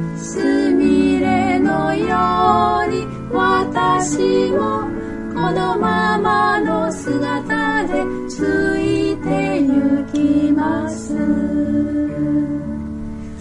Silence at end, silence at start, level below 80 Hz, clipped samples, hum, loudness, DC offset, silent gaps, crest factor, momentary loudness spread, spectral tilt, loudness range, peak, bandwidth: 0 s; 0 s; -40 dBFS; under 0.1%; none; -17 LUFS; under 0.1%; none; 16 dB; 8 LU; -6 dB/octave; 2 LU; -2 dBFS; 11 kHz